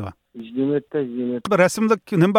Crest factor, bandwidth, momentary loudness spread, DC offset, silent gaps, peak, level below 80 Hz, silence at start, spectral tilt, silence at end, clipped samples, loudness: 16 dB; 16 kHz; 14 LU; under 0.1%; none; -4 dBFS; -62 dBFS; 0 s; -6 dB/octave; 0 s; under 0.1%; -21 LUFS